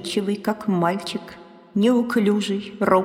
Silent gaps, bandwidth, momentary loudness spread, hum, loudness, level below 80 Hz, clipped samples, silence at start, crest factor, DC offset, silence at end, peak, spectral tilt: none; 15.5 kHz; 11 LU; none; -22 LUFS; -62 dBFS; under 0.1%; 0 s; 16 dB; under 0.1%; 0 s; -6 dBFS; -6 dB/octave